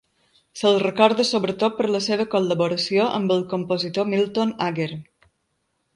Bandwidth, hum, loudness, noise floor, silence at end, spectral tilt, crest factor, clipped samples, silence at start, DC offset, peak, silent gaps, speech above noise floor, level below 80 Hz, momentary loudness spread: 11.5 kHz; none; -21 LUFS; -73 dBFS; 0.9 s; -5 dB/octave; 22 dB; under 0.1%; 0.55 s; under 0.1%; 0 dBFS; none; 52 dB; -66 dBFS; 7 LU